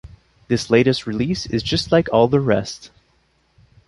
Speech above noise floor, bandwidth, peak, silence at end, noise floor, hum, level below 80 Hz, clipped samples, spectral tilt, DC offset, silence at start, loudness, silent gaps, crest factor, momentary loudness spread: 44 dB; 11.5 kHz; 0 dBFS; 1 s; -62 dBFS; none; -44 dBFS; under 0.1%; -6 dB/octave; under 0.1%; 0.05 s; -18 LUFS; none; 20 dB; 8 LU